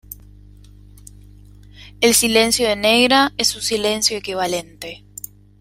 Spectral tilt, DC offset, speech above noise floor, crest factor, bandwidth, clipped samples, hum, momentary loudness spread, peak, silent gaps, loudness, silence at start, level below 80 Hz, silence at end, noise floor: -1.5 dB/octave; under 0.1%; 26 dB; 18 dB; 16.5 kHz; under 0.1%; 50 Hz at -40 dBFS; 22 LU; -2 dBFS; none; -16 LUFS; 0.1 s; -46 dBFS; 0.65 s; -43 dBFS